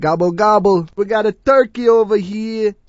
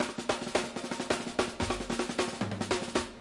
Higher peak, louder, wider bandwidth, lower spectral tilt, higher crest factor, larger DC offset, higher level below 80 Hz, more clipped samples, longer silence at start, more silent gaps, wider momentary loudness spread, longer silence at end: first, 0 dBFS vs -12 dBFS; first, -15 LUFS vs -33 LUFS; second, 7.8 kHz vs 11.5 kHz; first, -7 dB/octave vs -3.5 dB/octave; second, 14 dB vs 20 dB; neither; first, -48 dBFS vs -54 dBFS; neither; about the same, 0 s vs 0 s; neither; first, 6 LU vs 3 LU; first, 0.15 s vs 0 s